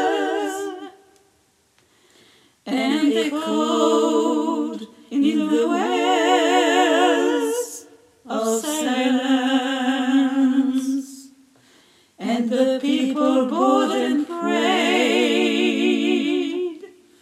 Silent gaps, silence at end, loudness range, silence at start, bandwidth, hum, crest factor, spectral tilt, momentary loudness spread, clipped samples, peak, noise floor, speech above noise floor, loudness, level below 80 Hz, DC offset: none; 0.35 s; 3 LU; 0 s; 15.5 kHz; none; 16 dB; -3.5 dB/octave; 11 LU; under 0.1%; -4 dBFS; -62 dBFS; 42 dB; -20 LUFS; -80 dBFS; under 0.1%